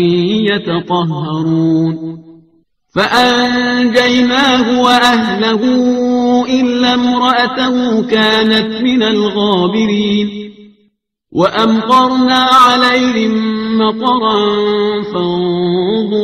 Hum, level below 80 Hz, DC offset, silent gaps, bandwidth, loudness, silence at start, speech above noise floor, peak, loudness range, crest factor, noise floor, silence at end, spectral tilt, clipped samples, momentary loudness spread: none; -48 dBFS; under 0.1%; none; 13.5 kHz; -11 LUFS; 0 s; 48 dB; 0 dBFS; 4 LU; 12 dB; -59 dBFS; 0 s; -5 dB/octave; under 0.1%; 7 LU